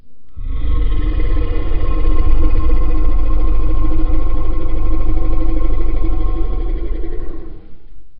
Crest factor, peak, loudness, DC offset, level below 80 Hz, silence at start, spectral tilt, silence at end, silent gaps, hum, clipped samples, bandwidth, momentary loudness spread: 10 dB; 0 dBFS; -21 LUFS; under 0.1%; -14 dBFS; 0.05 s; -8 dB/octave; 0 s; none; none; under 0.1%; 3.3 kHz; 9 LU